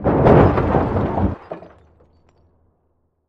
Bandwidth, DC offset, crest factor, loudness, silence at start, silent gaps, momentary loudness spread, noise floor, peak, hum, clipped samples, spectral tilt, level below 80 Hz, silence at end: 6.2 kHz; under 0.1%; 18 dB; -16 LUFS; 0 s; none; 22 LU; -66 dBFS; 0 dBFS; none; under 0.1%; -10.5 dB/octave; -30 dBFS; 1.7 s